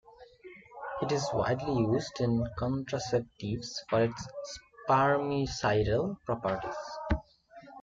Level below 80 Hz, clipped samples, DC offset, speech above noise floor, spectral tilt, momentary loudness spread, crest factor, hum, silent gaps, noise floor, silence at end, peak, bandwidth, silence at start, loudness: -48 dBFS; under 0.1%; under 0.1%; 24 dB; -6 dB/octave; 14 LU; 18 dB; none; none; -54 dBFS; 0 s; -14 dBFS; 7.8 kHz; 0.2 s; -31 LUFS